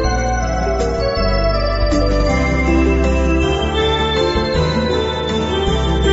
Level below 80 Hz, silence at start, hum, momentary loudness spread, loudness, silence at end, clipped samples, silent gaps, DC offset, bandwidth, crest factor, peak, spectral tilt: -20 dBFS; 0 s; none; 3 LU; -16 LUFS; 0 s; under 0.1%; none; under 0.1%; 8 kHz; 12 dB; -2 dBFS; -5.5 dB/octave